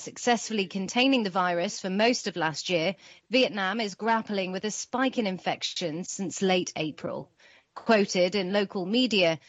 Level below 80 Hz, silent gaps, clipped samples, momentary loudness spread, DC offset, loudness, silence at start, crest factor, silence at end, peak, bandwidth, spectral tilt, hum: -74 dBFS; none; under 0.1%; 9 LU; under 0.1%; -27 LUFS; 0 s; 20 dB; 0.1 s; -8 dBFS; 8.4 kHz; -4 dB/octave; none